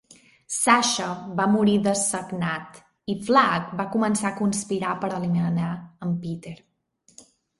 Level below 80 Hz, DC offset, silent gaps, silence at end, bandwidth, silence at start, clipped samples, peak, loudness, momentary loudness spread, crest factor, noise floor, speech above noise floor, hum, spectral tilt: -62 dBFS; under 0.1%; none; 1.05 s; 11.5 kHz; 0.5 s; under 0.1%; -2 dBFS; -24 LUFS; 13 LU; 22 dB; -63 dBFS; 40 dB; none; -4.5 dB/octave